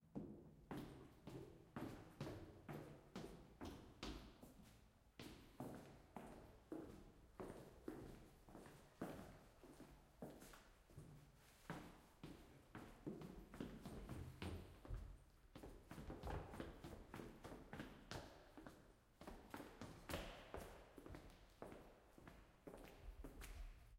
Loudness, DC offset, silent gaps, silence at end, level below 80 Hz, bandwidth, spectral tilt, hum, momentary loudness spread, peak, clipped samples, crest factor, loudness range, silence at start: -59 LUFS; under 0.1%; none; 0 s; -66 dBFS; 16 kHz; -5.5 dB/octave; none; 10 LU; -32 dBFS; under 0.1%; 24 dB; 4 LU; 0 s